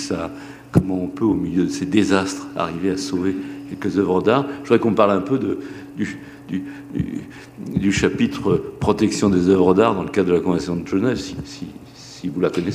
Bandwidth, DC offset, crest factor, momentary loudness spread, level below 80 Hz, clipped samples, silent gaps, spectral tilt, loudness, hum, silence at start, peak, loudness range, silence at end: 14.5 kHz; under 0.1%; 18 dB; 15 LU; -46 dBFS; under 0.1%; none; -6 dB/octave; -20 LUFS; none; 0 s; -2 dBFS; 5 LU; 0 s